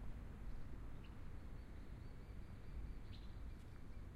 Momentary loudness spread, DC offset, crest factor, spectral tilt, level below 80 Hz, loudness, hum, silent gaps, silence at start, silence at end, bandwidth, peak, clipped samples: 3 LU; under 0.1%; 12 dB; -7 dB/octave; -52 dBFS; -56 LUFS; none; none; 0 s; 0 s; 12.5 kHz; -38 dBFS; under 0.1%